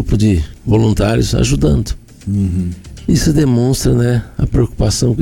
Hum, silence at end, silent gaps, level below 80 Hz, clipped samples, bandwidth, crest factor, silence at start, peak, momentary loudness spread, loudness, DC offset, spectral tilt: none; 0 s; none; -24 dBFS; under 0.1%; 17.5 kHz; 10 dB; 0 s; -4 dBFS; 8 LU; -14 LUFS; under 0.1%; -6 dB/octave